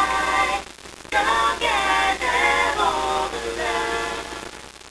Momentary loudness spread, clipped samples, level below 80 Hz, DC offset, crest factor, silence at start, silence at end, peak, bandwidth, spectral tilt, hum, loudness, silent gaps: 15 LU; under 0.1%; -44 dBFS; under 0.1%; 16 dB; 0 s; 0 s; -6 dBFS; 11 kHz; -2 dB/octave; none; -21 LUFS; none